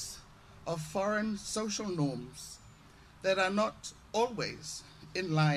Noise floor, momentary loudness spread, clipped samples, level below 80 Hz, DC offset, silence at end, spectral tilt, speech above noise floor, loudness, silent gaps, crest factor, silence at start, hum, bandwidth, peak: -57 dBFS; 16 LU; under 0.1%; -62 dBFS; under 0.1%; 0 s; -4.5 dB/octave; 24 dB; -34 LUFS; none; 18 dB; 0 s; none; 14.5 kHz; -16 dBFS